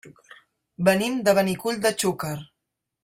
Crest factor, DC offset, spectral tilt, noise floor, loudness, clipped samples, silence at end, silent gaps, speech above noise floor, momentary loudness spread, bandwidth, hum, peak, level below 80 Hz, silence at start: 20 dB; under 0.1%; -4.5 dB/octave; -82 dBFS; -23 LUFS; under 0.1%; 0.6 s; none; 59 dB; 11 LU; 16 kHz; none; -6 dBFS; -62 dBFS; 0.05 s